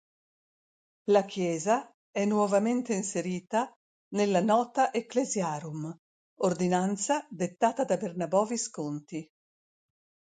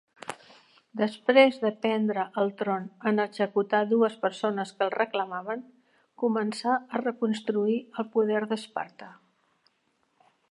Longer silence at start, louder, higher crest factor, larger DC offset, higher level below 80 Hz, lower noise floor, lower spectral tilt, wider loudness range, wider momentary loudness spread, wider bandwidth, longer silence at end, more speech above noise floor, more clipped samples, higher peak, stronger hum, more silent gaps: first, 1.05 s vs 0.3 s; about the same, -29 LUFS vs -27 LUFS; about the same, 20 dB vs 22 dB; neither; first, -76 dBFS vs -84 dBFS; first, under -90 dBFS vs -72 dBFS; about the same, -5 dB/octave vs -5.5 dB/octave; second, 2 LU vs 5 LU; about the same, 12 LU vs 14 LU; second, 9.4 kHz vs 11.5 kHz; second, 1.05 s vs 1.4 s; first, over 62 dB vs 45 dB; neither; second, -10 dBFS vs -6 dBFS; neither; first, 1.94-2.13 s, 3.76-4.11 s, 5.99-6.37 s vs none